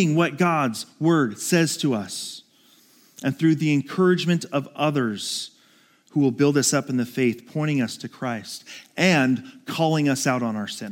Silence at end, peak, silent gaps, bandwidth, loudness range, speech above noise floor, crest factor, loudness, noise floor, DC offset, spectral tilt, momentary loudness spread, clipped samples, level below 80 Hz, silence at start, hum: 0 s; -4 dBFS; none; 17 kHz; 1 LU; 35 dB; 18 dB; -23 LUFS; -58 dBFS; under 0.1%; -5 dB/octave; 11 LU; under 0.1%; -74 dBFS; 0 s; none